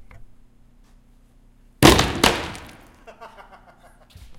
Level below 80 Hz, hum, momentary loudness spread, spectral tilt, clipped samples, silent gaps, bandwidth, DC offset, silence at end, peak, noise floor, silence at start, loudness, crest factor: -36 dBFS; 60 Hz at -45 dBFS; 20 LU; -4 dB/octave; under 0.1%; none; 17 kHz; under 0.1%; 1.1 s; 0 dBFS; -52 dBFS; 0.2 s; -17 LUFS; 24 dB